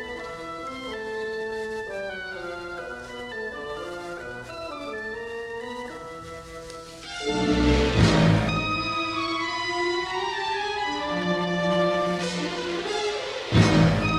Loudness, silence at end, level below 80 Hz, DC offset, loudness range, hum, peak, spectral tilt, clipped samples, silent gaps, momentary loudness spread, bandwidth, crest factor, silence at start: -26 LUFS; 0 s; -40 dBFS; under 0.1%; 11 LU; none; -6 dBFS; -5.5 dB/octave; under 0.1%; none; 16 LU; 12 kHz; 20 dB; 0 s